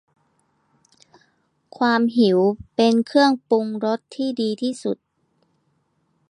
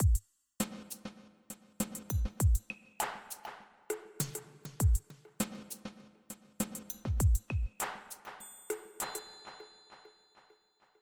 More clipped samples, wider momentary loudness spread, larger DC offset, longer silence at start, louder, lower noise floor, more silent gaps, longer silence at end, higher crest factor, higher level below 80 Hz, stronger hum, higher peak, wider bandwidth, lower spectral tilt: neither; second, 9 LU vs 19 LU; neither; first, 1.8 s vs 0 s; first, -20 LUFS vs -37 LUFS; about the same, -68 dBFS vs -69 dBFS; neither; first, 1.35 s vs 1.05 s; about the same, 18 dB vs 18 dB; second, -62 dBFS vs -38 dBFS; neither; first, -4 dBFS vs -18 dBFS; second, 10.5 kHz vs over 20 kHz; about the same, -5.5 dB/octave vs -5 dB/octave